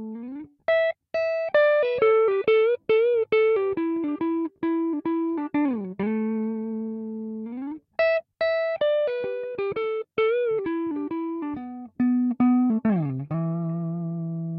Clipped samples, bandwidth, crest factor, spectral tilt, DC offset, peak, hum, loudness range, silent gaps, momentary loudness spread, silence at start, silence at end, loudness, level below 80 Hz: under 0.1%; 5.6 kHz; 14 dB; -9.5 dB/octave; under 0.1%; -10 dBFS; none; 6 LU; none; 12 LU; 0 s; 0 s; -25 LUFS; -68 dBFS